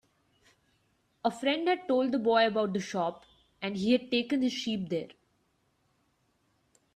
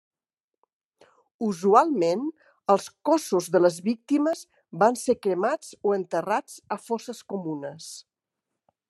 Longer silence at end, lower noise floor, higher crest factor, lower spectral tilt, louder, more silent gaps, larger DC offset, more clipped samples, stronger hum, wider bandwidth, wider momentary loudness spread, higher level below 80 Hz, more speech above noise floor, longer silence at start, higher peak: first, 1.85 s vs 0.9 s; second, -73 dBFS vs -89 dBFS; about the same, 20 dB vs 22 dB; about the same, -5 dB/octave vs -5.5 dB/octave; second, -30 LUFS vs -25 LUFS; neither; neither; neither; neither; second, 11.5 kHz vs 13 kHz; second, 10 LU vs 15 LU; first, -72 dBFS vs -78 dBFS; second, 44 dB vs 65 dB; second, 1.25 s vs 1.4 s; second, -12 dBFS vs -4 dBFS